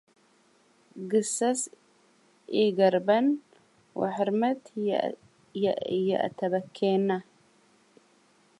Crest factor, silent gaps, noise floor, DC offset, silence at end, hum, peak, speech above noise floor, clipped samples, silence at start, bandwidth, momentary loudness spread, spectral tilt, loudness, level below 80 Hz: 20 dB; none; -64 dBFS; under 0.1%; 1.4 s; none; -10 dBFS; 37 dB; under 0.1%; 0.95 s; 11.5 kHz; 11 LU; -5 dB/octave; -27 LUFS; -78 dBFS